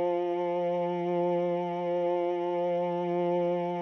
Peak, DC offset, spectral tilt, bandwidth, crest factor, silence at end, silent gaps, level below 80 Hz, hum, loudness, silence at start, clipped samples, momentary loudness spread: -18 dBFS; under 0.1%; -9 dB/octave; 6.2 kHz; 10 dB; 0 s; none; -80 dBFS; none; -29 LUFS; 0 s; under 0.1%; 2 LU